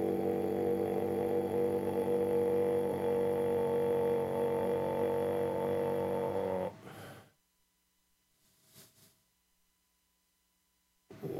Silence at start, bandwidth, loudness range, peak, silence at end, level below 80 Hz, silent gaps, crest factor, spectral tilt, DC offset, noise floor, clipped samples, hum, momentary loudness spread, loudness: 0 s; 15 kHz; 8 LU; -20 dBFS; 0 s; -70 dBFS; none; 14 dB; -7.5 dB/octave; under 0.1%; -77 dBFS; under 0.1%; none; 5 LU; -33 LUFS